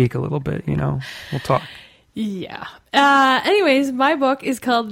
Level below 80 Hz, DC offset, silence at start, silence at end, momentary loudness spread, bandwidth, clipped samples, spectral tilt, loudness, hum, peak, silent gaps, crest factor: -48 dBFS; under 0.1%; 0 s; 0 s; 15 LU; 16.5 kHz; under 0.1%; -5.5 dB/octave; -18 LUFS; none; -4 dBFS; none; 16 dB